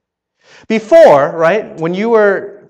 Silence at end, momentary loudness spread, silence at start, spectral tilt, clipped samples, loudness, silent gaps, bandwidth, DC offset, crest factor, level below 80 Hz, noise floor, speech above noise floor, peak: 0.2 s; 13 LU; 0.7 s; -6 dB/octave; 1%; -10 LUFS; none; 9 kHz; under 0.1%; 12 dB; -56 dBFS; -55 dBFS; 45 dB; 0 dBFS